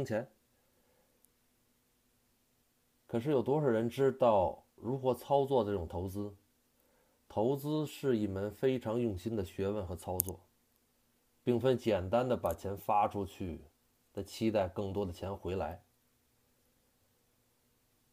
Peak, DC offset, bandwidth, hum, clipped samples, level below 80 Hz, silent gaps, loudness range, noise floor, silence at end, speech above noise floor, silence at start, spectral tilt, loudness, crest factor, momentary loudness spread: -8 dBFS; under 0.1%; 15.5 kHz; none; under 0.1%; -62 dBFS; none; 7 LU; -74 dBFS; 2.35 s; 41 dB; 0 s; -6.5 dB/octave; -34 LUFS; 28 dB; 12 LU